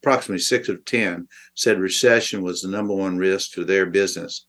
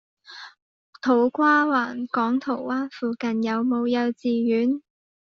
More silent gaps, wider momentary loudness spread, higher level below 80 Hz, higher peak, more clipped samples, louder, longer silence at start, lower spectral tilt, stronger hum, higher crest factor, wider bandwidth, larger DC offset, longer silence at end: second, none vs 0.62-0.93 s; about the same, 8 LU vs 10 LU; about the same, -70 dBFS vs -72 dBFS; first, -2 dBFS vs -8 dBFS; neither; about the same, -21 LUFS vs -23 LUFS; second, 0.05 s vs 0.3 s; about the same, -3 dB/octave vs -3.5 dB/octave; neither; about the same, 20 dB vs 16 dB; first, 12.5 kHz vs 6.6 kHz; neither; second, 0.1 s vs 0.55 s